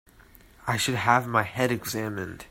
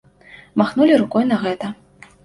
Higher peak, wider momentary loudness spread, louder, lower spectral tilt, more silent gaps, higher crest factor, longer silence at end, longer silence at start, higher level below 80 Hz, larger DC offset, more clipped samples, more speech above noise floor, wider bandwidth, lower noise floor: about the same, -4 dBFS vs -2 dBFS; second, 11 LU vs 15 LU; second, -26 LUFS vs -18 LUFS; second, -4.5 dB/octave vs -7 dB/octave; neither; first, 22 dB vs 16 dB; second, 0.05 s vs 0.5 s; about the same, 0.65 s vs 0.55 s; about the same, -56 dBFS vs -58 dBFS; neither; neither; about the same, 28 dB vs 29 dB; first, 16.5 kHz vs 11.5 kHz; first, -54 dBFS vs -45 dBFS